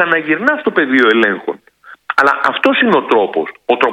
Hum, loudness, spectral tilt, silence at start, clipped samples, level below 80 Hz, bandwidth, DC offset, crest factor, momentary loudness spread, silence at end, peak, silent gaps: none; -13 LUFS; -5.5 dB/octave; 0 s; 0.2%; -60 dBFS; 10.5 kHz; under 0.1%; 14 dB; 9 LU; 0 s; 0 dBFS; none